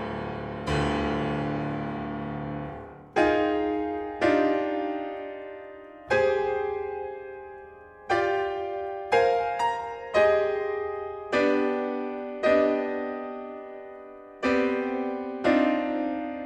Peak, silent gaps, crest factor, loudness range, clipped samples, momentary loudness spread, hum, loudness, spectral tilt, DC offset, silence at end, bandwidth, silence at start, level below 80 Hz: -10 dBFS; none; 18 dB; 4 LU; under 0.1%; 17 LU; none; -27 LUFS; -6.5 dB/octave; under 0.1%; 0 s; 9.6 kHz; 0 s; -50 dBFS